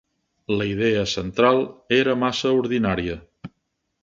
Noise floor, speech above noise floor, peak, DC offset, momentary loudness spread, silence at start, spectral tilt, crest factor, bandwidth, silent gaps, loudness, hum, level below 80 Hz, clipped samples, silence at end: -75 dBFS; 54 dB; -4 dBFS; under 0.1%; 8 LU; 0.5 s; -5.5 dB/octave; 18 dB; 7.6 kHz; none; -21 LUFS; none; -48 dBFS; under 0.1%; 0.55 s